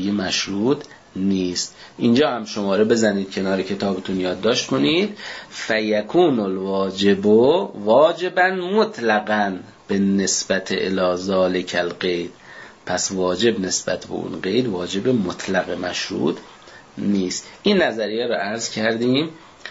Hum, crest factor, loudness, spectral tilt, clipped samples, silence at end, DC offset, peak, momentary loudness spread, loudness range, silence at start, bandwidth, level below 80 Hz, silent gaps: none; 16 dB; -20 LUFS; -4 dB/octave; under 0.1%; 0 s; under 0.1%; -4 dBFS; 9 LU; 5 LU; 0 s; 8 kHz; -58 dBFS; none